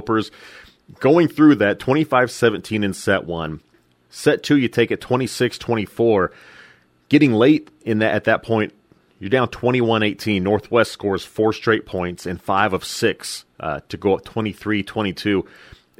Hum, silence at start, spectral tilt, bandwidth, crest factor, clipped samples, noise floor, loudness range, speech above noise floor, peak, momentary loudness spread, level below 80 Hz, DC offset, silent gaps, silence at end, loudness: none; 0 s; -6 dB/octave; 15.5 kHz; 18 dB; under 0.1%; -51 dBFS; 4 LU; 32 dB; 0 dBFS; 12 LU; -52 dBFS; under 0.1%; none; 0.55 s; -19 LUFS